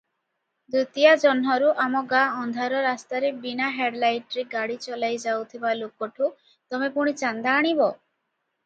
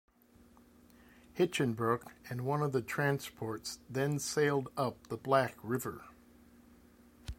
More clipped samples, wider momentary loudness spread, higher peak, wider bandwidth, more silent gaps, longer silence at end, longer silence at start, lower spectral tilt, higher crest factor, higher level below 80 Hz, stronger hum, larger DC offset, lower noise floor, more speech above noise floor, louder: neither; about the same, 10 LU vs 12 LU; first, -4 dBFS vs -14 dBFS; second, 8.8 kHz vs 16.5 kHz; neither; first, 0.7 s vs 0.05 s; second, 0.7 s vs 1.35 s; second, -3.5 dB/octave vs -5.5 dB/octave; about the same, 20 dB vs 22 dB; second, -78 dBFS vs -62 dBFS; neither; neither; first, -78 dBFS vs -63 dBFS; first, 54 dB vs 29 dB; first, -24 LUFS vs -35 LUFS